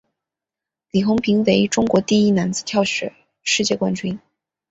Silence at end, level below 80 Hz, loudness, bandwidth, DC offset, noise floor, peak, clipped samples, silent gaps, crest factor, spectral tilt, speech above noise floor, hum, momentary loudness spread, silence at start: 0.5 s; -54 dBFS; -19 LUFS; 8 kHz; under 0.1%; -87 dBFS; -2 dBFS; under 0.1%; none; 18 dB; -4.5 dB/octave; 69 dB; none; 11 LU; 0.95 s